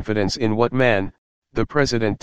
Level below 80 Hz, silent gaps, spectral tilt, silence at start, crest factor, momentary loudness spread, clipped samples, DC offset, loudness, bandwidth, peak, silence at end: -42 dBFS; 1.18-1.42 s; -5.5 dB/octave; 0 s; 20 dB; 10 LU; under 0.1%; under 0.1%; -20 LUFS; 9.6 kHz; -2 dBFS; 0 s